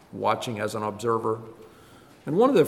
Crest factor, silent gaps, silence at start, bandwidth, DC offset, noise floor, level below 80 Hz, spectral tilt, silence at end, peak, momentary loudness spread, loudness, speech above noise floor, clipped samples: 18 dB; none; 0.15 s; 14.5 kHz; under 0.1%; -51 dBFS; -68 dBFS; -6 dB/octave; 0 s; -8 dBFS; 13 LU; -27 LUFS; 27 dB; under 0.1%